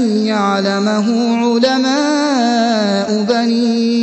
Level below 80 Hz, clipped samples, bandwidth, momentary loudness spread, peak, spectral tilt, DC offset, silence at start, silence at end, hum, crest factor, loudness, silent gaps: -64 dBFS; under 0.1%; 8.4 kHz; 2 LU; 0 dBFS; -5 dB/octave; under 0.1%; 0 s; 0 s; none; 12 dB; -14 LUFS; none